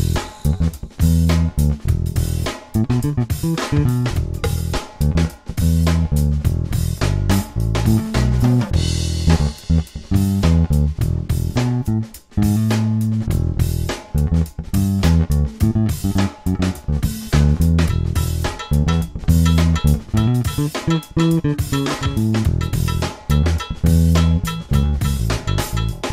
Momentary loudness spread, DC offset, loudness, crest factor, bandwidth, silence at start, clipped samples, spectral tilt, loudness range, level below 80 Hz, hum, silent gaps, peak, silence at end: 6 LU; under 0.1%; -19 LUFS; 14 dB; 16 kHz; 0 s; under 0.1%; -6.5 dB/octave; 2 LU; -24 dBFS; none; none; -2 dBFS; 0 s